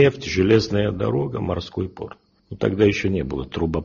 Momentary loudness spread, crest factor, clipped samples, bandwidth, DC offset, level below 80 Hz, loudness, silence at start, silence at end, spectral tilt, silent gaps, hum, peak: 13 LU; 16 dB; under 0.1%; 7.2 kHz; under 0.1%; -42 dBFS; -22 LUFS; 0 s; 0 s; -6 dB/octave; none; none; -4 dBFS